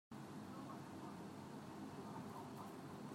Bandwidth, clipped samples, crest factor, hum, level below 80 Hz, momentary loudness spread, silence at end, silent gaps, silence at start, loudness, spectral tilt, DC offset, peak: 16 kHz; under 0.1%; 14 dB; none; -84 dBFS; 2 LU; 0 s; none; 0.1 s; -53 LUFS; -6 dB/octave; under 0.1%; -38 dBFS